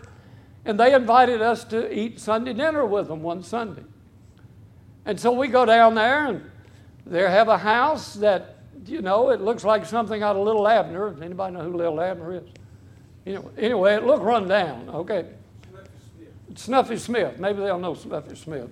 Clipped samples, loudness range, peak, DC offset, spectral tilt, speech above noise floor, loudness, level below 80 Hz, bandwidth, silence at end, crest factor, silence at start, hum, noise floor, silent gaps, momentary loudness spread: under 0.1%; 7 LU; -4 dBFS; under 0.1%; -5.5 dB/octave; 29 dB; -22 LUFS; -60 dBFS; 13 kHz; 0.05 s; 20 dB; 0.05 s; none; -50 dBFS; none; 17 LU